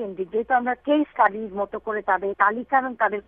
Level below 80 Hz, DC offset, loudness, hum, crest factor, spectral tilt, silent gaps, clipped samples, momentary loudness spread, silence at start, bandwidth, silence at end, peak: -60 dBFS; under 0.1%; -23 LUFS; none; 20 dB; -8.5 dB/octave; none; under 0.1%; 8 LU; 0 s; 4.1 kHz; 0.05 s; -4 dBFS